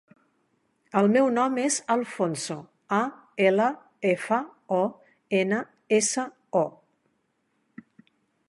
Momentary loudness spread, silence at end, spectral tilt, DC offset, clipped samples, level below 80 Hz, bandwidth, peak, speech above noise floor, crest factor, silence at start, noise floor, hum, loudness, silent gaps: 9 LU; 1.8 s; -4.5 dB/octave; under 0.1%; under 0.1%; -76 dBFS; 11.5 kHz; -8 dBFS; 49 dB; 20 dB; 0.95 s; -73 dBFS; none; -26 LUFS; none